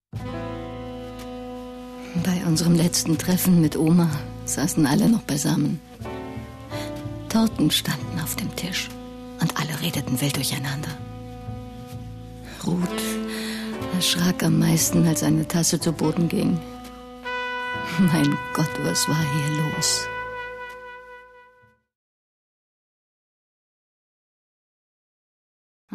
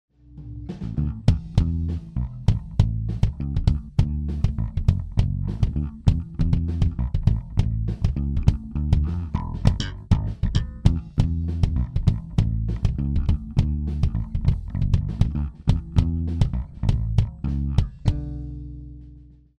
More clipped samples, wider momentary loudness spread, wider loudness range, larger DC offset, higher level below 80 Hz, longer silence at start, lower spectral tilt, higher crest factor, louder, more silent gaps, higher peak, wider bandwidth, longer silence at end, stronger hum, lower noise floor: neither; first, 18 LU vs 6 LU; first, 7 LU vs 1 LU; neither; second, -48 dBFS vs -26 dBFS; second, 0.15 s vs 0.3 s; second, -4.5 dB/octave vs -8.5 dB/octave; about the same, 16 dB vs 20 dB; about the same, -23 LUFS vs -25 LUFS; neither; second, -10 dBFS vs -2 dBFS; first, 14 kHz vs 8.8 kHz; first, 4.55 s vs 0.35 s; neither; first, -57 dBFS vs -47 dBFS